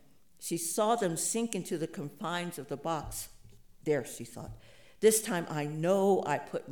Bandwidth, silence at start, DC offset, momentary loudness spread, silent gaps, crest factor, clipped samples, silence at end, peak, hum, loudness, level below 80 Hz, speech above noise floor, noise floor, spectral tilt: 19.5 kHz; 0.4 s; 0.1%; 16 LU; none; 20 dB; under 0.1%; 0 s; -12 dBFS; none; -32 LUFS; -60 dBFS; 25 dB; -57 dBFS; -4 dB/octave